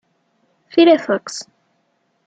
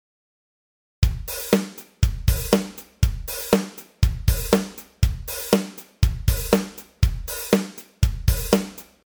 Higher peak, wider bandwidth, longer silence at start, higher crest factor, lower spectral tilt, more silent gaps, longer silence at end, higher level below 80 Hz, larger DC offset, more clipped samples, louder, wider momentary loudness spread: about the same, -2 dBFS vs -2 dBFS; second, 8.8 kHz vs over 20 kHz; second, 0.75 s vs 1 s; about the same, 18 dB vs 22 dB; second, -4 dB/octave vs -5.5 dB/octave; neither; first, 0.85 s vs 0.2 s; second, -70 dBFS vs -28 dBFS; neither; neither; first, -15 LUFS vs -23 LUFS; first, 18 LU vs 9 LU